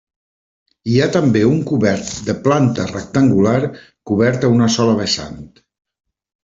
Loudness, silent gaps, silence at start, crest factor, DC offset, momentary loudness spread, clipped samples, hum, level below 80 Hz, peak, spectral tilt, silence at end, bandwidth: -16 LUFS; none; 0.85 s; 16 dB; under 0.1%; 9 LU; under 0.1%; none; -50 dBFS; 0 dBFS; -6 dB/octave; 1 s; 7.8 kHz